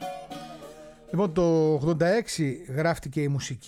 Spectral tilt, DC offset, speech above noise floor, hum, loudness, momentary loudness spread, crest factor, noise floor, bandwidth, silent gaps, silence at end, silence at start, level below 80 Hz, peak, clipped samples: -6 dB/octave; under 0.1%; 21 dB; none; -26 LUFS; 18 LU; 14 dB; -46 dBFS; 14.5 kHz; none; 0 s; 0 s; -52 dBFS; -12 dBFS; under 0.1%